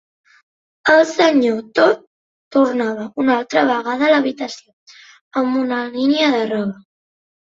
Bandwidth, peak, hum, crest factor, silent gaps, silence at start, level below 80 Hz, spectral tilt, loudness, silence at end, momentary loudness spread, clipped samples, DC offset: 7.8 kHz; 0 dBFS; none; 18 dB; 2.07-2.51 s, 4.73-4.86 s, 5.21-5.31 s; 0.85 s; -64 dBFS; -4.5 dB/octave; -17 LUFS; 0.75 s; 10 LU; under 0.1%; under 0.1%